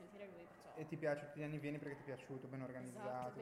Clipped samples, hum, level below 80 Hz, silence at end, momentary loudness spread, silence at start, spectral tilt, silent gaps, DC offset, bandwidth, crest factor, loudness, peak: under 0.1%; none; -82 dBFS; 0 s; 13 LU; 0 s; -7 dB/octave; none; under 0.1%; 15.5 kHz; 18 dB; -48 LUFS; -30 dBFS